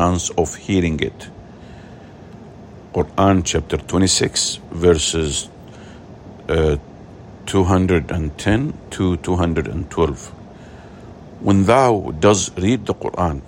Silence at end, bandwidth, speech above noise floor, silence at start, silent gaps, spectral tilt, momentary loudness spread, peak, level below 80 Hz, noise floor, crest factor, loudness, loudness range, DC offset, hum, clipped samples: 0.05 s; 16 kHz; 21 dB; 0 s; none; -5 dB/octave; 24 LU; -2 dBFS; -38 dBFS; -39 dBFS; 18 dB; -18 LUFS; 4 LU; under 0.1%; none; under 0.1%